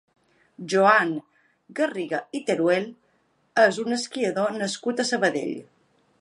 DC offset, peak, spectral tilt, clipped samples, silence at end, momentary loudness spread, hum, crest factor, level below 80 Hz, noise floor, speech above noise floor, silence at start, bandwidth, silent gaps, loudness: under 0.1%; -4 dBFS; -4 dB/octave; under 0.1%; 0.6 s; 15 LU; none; 22 dB; -78 dBFS; -67 dBFS; 43 dB; 0.6 s; 11.5 kHz; none; -24 LUFS